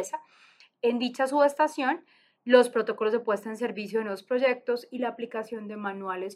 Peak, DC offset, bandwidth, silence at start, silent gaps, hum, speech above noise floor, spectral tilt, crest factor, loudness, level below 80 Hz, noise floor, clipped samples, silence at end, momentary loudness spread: -6 dBFS; under 0.1%; 14 kHz; 0 s; none; none; 32 dB; -4.5 dB/octave; 22 dB; -27 LUFS; -88 dBFS; -59 dBFS; under 0.1%; 0 s; 13 LU